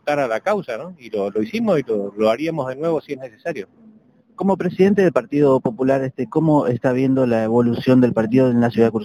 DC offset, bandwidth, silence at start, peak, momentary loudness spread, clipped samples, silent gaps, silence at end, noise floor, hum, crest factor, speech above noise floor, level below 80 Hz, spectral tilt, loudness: under 0.1%; 11.5 kHz; 0.05 s; -2 dBFS; 13 LU; under 0.1%; none; 0 s; -51 dBFS; none; 16 dB; 33 dB; -56 dBFS; -8 dB/octave; -19 LUFS